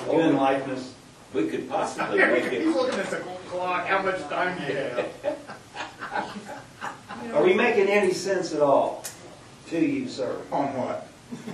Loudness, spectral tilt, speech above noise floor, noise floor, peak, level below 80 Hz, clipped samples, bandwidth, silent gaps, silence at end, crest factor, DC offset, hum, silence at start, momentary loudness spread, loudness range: -25 LUFS; -5 dB/octave; 21 dB; -46 dBFS; -6 dBFS; -64 dBFS; under 0.1%; 12.5 kHz; none; 0 s; 20 dB; under 0.1%; none; 0 s; 17 LU; 5 LU